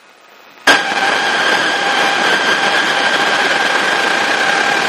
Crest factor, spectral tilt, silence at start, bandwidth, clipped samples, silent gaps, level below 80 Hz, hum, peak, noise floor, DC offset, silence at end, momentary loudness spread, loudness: 14 dB; -1 dB/octave; 0.65 s; 15.5 kHz; under 0.1%; none; -60 dBFS; none; 0 dBFS; -42 dBFS; under 0.1%; 0 s; 1 LU; -12 LUFS